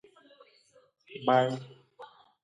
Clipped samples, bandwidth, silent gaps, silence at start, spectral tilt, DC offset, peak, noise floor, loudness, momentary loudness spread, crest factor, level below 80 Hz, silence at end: under 0.1%; 9.8 kHz; none; 1.1 s; -6.5 dB/octave; under 0.1%; -10 dBFS; -63 dBFS; -28 LUFS; 26 LU; 22 dB; -80 dBFS; 0.4 s